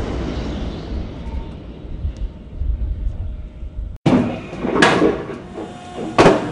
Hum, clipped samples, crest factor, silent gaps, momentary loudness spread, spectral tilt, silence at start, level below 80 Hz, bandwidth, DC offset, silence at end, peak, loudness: none; under 0.1%; 18 dB; 3.96-4.05 s; 19 LU; -6 dB/octave; 0 s; -28 dBFS; 11 kHz; under 0.1%; 0 s; -2 dBFS; -20 LUFS